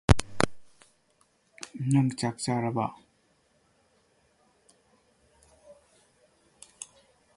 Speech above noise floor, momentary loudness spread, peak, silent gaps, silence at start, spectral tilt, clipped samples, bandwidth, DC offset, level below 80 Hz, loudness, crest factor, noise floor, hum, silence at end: 41 dB; 20 LU; -2 dBFS; none; 0.1 s; -5.5 dB/octave; under 0.1%; 11.5 kHz; under 0.1%; -44 dBFS; -29 LUFS; 30 dB; -68 dBFS; none; 0.5 s